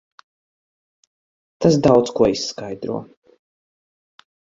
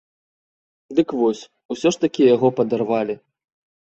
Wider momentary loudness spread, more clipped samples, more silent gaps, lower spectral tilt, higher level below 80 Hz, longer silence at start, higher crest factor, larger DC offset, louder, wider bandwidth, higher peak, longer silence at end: about the same, 14 LU vs 14 LU; neither; second, none vs 1.65-1.69 s; about the same, -6 dB/octave vs -6 dB/octave; first, -52 dBFS vs -64 dBFS; first, 1.6 s vs 0.9 s; about the same, 22 dB vs 18 dB; neither; about the same, -19 LUFS vs -20 LUFS; about the same, 7.8 kHz vs 8.2 kHz; about the same, -2 dBFS vs -4 dBFS; first, 1.5 s vs 0.7 s